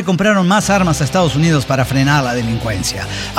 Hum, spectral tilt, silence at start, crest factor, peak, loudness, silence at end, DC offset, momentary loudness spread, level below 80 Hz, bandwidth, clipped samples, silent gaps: none; -5 dB/octave; 0 s; 12 dB; -2 dBFS; -14 LUFS; 0 s; under 0.1%; 6 LU; -34 dBFS; 16.5 kHz; under 0.1%; none